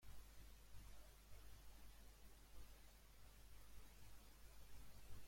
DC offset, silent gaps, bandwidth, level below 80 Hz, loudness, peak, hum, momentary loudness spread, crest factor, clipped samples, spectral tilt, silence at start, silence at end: under 0.1%; none; 16.5 kHz; -66 dBFS; -66 LUFS; -42 dBFS; none; 2 LU; 16 dB; under 0.1%; -3.5 dB/octave; 0 s; 0 s